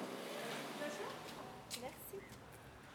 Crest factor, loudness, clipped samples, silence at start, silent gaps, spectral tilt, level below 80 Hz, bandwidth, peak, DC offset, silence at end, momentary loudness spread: 18 dB; -48 LUFS; under 0.1%; 0 s; none; -3 dB/octave; -72 dBFS; over 20 kHz; -30 dBFS; under 0.1%; 0 s; 11 LU